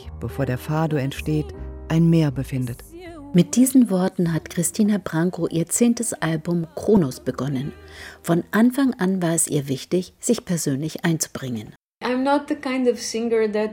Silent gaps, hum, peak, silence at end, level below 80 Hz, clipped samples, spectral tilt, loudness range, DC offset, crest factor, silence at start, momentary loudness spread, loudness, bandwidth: 11.76-12.01 s; none; -4 dBFS; 0 s; -46 dBFS; under 0.1%; -5.5 dB/octave; 3 LU; under 0.1%; 18 dB; 0 s; 12 LU; -22 LUFS; 17.5 kHz